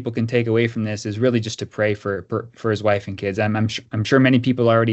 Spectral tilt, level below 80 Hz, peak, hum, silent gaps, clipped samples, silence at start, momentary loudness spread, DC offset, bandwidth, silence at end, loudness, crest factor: -6.5 dB/octave; -58 dBFS; -2 dBFS; none; none; under 0.1%; 0 s; 9 LU; under 0.1%; 8.2 kHz; 0 s; -20 LUFS; 18 dB